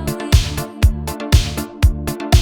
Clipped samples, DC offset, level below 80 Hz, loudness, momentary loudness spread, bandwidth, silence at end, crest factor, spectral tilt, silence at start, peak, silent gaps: under 0.1%; under 0.1%; -20 dBFS; -18 LUFS; 8 LU; 19 kHz; 0 s; 16 dB; -5 dB/octave; 0 s; 0 dBFS; none